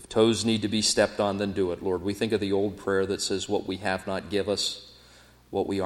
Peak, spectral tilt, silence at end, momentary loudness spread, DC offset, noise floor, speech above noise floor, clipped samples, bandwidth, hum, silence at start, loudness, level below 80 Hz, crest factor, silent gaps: -10 dBFS; -4 dB/octave; 0 s; 7 LU; under 0.1%; -54 dBFS; 28 dB; under 0.1%; 16 kHz; none; 0 s; -27 LUFS; -56 dBFS; 18 dB; none